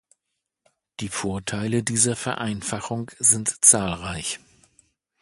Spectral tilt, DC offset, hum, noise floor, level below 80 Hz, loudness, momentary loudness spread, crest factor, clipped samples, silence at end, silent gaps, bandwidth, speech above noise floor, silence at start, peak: -3 dB/octave; under 0.1%; none; -81 dBFS; -52 dBFS; -21 LUFS; 16 LU; 24 dB; under 0.1%; 0.85 s; none; 12 kHz; 58 dB; 1 s; 0 dBFS